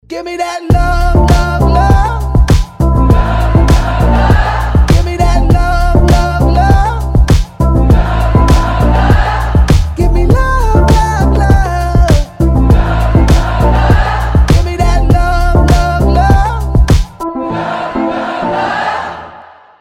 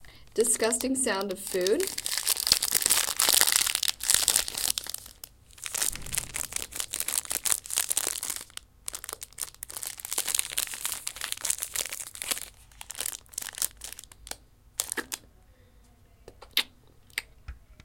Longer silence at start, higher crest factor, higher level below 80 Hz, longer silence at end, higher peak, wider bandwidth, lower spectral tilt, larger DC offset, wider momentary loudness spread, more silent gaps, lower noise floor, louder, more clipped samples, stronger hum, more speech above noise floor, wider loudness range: about the same, 0.1 s vs 0 s; second, 8 dB vs 30 dB; first, -12 dBFS vs -56 dBFS; first, 0.4 s vs 0.1 s; about the same, 0 dBFS vs 0 dBFS; second, 14 kHz vs 17 kHz; first, -7 dB/octave vs 0 dB/octave; neither; second, 6 LU vs 18 LU; neither; second, -35 dBFS vs -57 dBFS; first, -11 LUFS vs -27 LUFS; first, 0.3% vs under 0.1%; neither; second, 26 dB vs 30 dB; second, 1 LU vs 12 LU